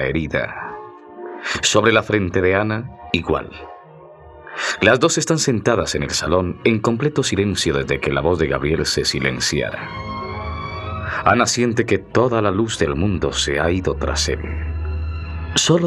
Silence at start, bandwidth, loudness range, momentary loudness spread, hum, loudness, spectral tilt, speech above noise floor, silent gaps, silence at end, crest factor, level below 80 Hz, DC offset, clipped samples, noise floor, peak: 0 s; 13.5 kHz; 2 LU; 12 LU; none; -19 LUFS; -4 dB/octave; 23 dB; none; 0 s; 18 dB; -36 dBFS; under 0.1%; under 0.1%; -42 dBFS; -2 dBFS